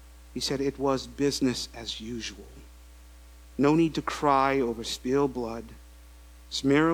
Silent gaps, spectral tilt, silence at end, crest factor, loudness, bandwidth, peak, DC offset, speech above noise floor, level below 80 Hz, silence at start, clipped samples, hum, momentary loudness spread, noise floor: none; -5 dB/octave; 0 s; 20 dB; -28 LUFS; 19.5 kHz; -8 dBFS; under 0.1%; 23 dB; -48 dBFS; 0 s; under 0.1%; none; 15 LU; -50 dBFS